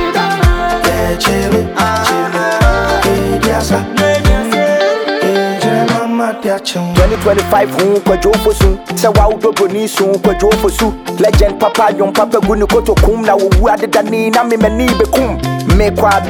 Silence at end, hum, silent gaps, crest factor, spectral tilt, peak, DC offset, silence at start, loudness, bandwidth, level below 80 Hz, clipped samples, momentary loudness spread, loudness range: 0 s; none; none; 10 dB; -5.5 dB/octave; 0 dBFS; under 0.1%; 0 s; -12 LUFS; 20 kHz; -20 dBFS; under 0.1%; 3 LU; 1 LU